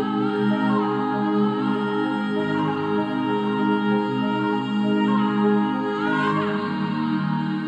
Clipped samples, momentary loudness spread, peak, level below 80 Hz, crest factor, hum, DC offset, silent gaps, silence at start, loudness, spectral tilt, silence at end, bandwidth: under 0.1%; 3 LU; -10 dBFS; -66 dBFS; 12 dB; none; under 0.1%; none; 0 s; -22 LUFS; -8 dB/octave; 0 s; 8 kHz